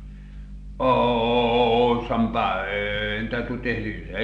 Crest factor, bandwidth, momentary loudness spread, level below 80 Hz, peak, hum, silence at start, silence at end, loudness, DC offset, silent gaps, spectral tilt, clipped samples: 16 dB; 7.2 kHz; 22 LU; -38 dBFS; -8 dBFS; 50 Hz at -40 dBFS; 0 s; 0 s; -23 LUFS; under 0.1%; none; -7.5 dB/octave; under 0.1%